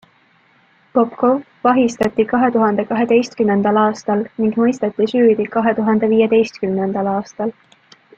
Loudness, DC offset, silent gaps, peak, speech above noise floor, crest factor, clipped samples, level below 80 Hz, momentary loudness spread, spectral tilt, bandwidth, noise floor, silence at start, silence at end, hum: -16 LUFS; under 0.1%; none; -2 dBFS; 39 dB; 14 dB; under 0.1%; -58 dBFS; 6 LU; -6.5 dB/octave; 7.8 kHz; -55 dBFS; 0.95 s; 0.65 s; none